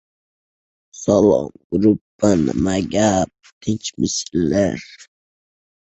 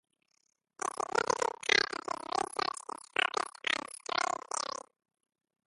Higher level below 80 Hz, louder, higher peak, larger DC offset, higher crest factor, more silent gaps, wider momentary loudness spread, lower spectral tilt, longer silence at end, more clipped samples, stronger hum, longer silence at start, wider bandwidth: first, -44 dBFS vs -76 dBFS; first, -19 LUFS vs -33 LUFS; first, -2 dBFS vs -8 dBFS; neither; second, 18 dB vs 26 dB; first, 1.64-1.70 s, 2.01-2.19 s, 3.52-3.61 s vs none; about the same, 10 LU vs 11 LU; first, -5.5 dB/octave vs -0.5 dB/octave; second, 0.8 s vs 1.05 s; neither; neither; about the same, 0.95 s vs 0.85 s; second, 8.2 kHz vs 12 kHz